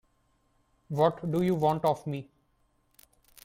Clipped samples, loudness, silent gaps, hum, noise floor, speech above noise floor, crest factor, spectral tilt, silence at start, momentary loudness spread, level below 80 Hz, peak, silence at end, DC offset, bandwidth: under 0.1%; -29 LUFS; none; none; -70 dBFS; 43 dB; 20 dB; -8 dB/octave; 0.9 s; 11 LU; -64 dBFS; -12 dBFS; 1.2 s; under 0.1%; 16.5 kHz